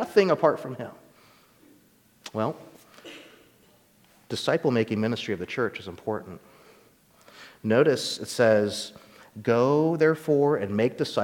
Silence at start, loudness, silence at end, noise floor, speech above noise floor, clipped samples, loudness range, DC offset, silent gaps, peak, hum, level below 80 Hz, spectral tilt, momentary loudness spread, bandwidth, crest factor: 0 s; -25 LUFS; 0 s; -60 dBFS; 36 dB; under 0.1%; 14 LU; under 0.1%; none; -6 dBFS; none; -68 dBFS; -5.5 dB/octave; 22 LU; 18 kHz; 20 dB